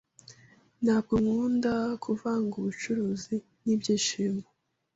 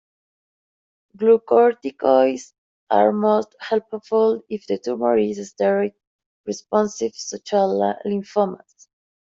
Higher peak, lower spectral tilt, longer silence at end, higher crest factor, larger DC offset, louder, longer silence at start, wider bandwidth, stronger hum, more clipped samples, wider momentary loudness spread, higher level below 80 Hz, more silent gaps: second, -14 dBFS vs -2 dBFS; about the same, -5 dB/octave vs -5.5 dB/octave; second, 0.55 s vs 0.75 s; about the same, 16 dB vs 18 dB; neither; second, -29 LUFS vs -20 LUFS; second, 0.3 s vs 1.2 s; about the same, 8 kHz vs 7.6 kHz; neither; neither; second, 7 LU vs 11 LU; first, -58 dBFS vs -68 dBFS; second, none vs 2.58-2.87 s, 6.07-6.19 s, 6.26-6.44 s